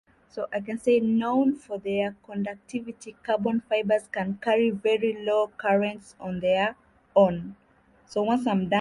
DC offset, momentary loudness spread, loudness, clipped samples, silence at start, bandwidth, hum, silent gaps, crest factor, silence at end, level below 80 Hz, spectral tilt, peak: under 0.1%; 13 LU; -26 LUFS; under 0.1%; 0.35 s; 11.5 kHz; none; none; 18 dB; 0 s; -62 dBFS; -6.5 dB/octave; -8 dBFS